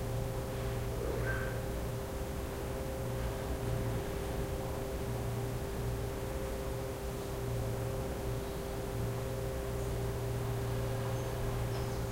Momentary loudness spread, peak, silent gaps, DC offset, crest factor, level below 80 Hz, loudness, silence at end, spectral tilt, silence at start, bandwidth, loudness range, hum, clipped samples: 3 LU; -22 dBFS; none; under 0.1%; 14 dB; -42 dBFS; -38 LUFS; 0 s; -6 dB/octave; 0 s; 16 kHz; 1 LU; none; under 0.1%